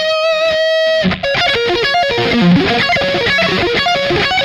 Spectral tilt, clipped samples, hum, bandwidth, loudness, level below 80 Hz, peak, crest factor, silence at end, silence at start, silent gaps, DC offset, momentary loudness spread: -5 dB/octave; under 0.1%; none; 13.5 kHz; -12 LUFS; -38 dBFS; -2 dBFS; 10 dB; 0 s; 0 s; none; under 0.1%; 3 LU